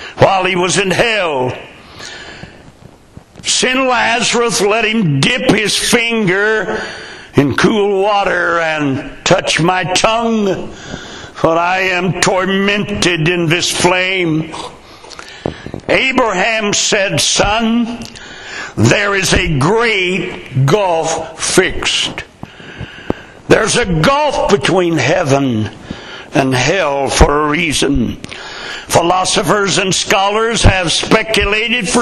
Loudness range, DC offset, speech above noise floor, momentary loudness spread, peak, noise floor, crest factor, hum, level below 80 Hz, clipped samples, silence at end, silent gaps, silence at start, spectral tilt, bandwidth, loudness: 3 LU; under 0.1%; 27 dB; 16 LU; 0 dBFS; -40 dBFS; 14 dB; none; -30 dBFS; under 0.1%; 0 s; none; 0 s; -3.5 dB/octave; 14.5 kHz; -12 LUFS